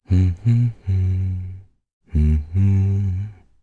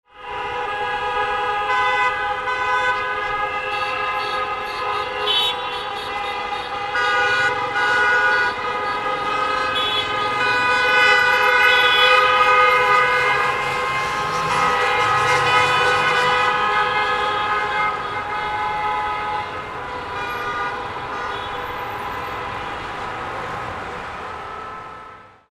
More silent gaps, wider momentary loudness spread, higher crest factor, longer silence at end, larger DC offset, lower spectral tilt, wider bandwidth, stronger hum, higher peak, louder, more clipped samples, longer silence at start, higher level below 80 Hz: first, 1.93-2.01 s vs none; second, 11 LU vs 14 LU; second, 12 dB vs 18 dB; about the same, 0.3 s vs 0.25 s; neither; first, -10 dB/octave vs -2.5 dB/octave; second, 4.3 kHz vs 15 kHz; neither; second, -6 dBFS vs -2 dBFS; about the same, -21 LUFS vs -19 LUFS; neither; about the same, 0.1 s vs 0.15 s; first, -28 dBFS vs -48 dBFS